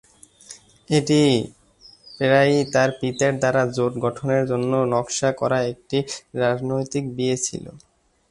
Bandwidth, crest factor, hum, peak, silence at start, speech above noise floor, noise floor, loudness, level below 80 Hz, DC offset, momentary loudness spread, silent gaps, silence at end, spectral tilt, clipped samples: 11.5 kHz; 18 dB; none; -4 dBFS; 0.5 s; 30 dB; -51 dBFS; -21 LUFS; -56 dBFS; under 0.1%; 10 LU; none; 0.55 s; -5 dB/octave; under 0.1%